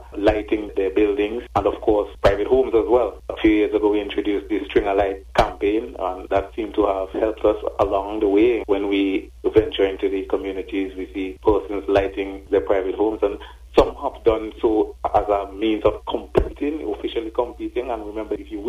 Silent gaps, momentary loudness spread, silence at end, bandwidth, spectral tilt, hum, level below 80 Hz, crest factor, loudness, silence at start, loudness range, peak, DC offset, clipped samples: none; 8 LU; 0 s; 11.5 kHz; -7 dB/octave; none; -38 dBFS; 20 dB; -21 LUFS; 0 s; 3 LU; -2 dBFS; under 0.1%; under 0.1%